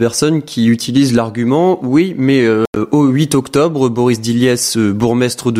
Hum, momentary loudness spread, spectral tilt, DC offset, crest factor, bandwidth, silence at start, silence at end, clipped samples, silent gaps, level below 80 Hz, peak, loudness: none; 3 LU; -5.5 dB/octave; under 0.1%; 12 dB; 16 kHz; 0 s; 0 s; under 0.1%; 2.67-2.73 s; -48 dBFS; 0 dBFS; -13 LUFS